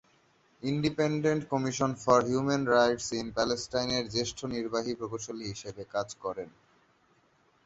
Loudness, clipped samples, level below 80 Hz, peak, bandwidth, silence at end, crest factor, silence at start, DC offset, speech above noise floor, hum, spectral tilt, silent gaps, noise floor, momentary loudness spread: -30 LUFS; under 0.1%; -60 dBFS; -8 dBFS; 8.2 kHz; 1.15 s; 22 dB; 0.6 s; under 0.1%; 37 dB; none; -4.5 dB/octave; none; -67 dBFS; 13 LU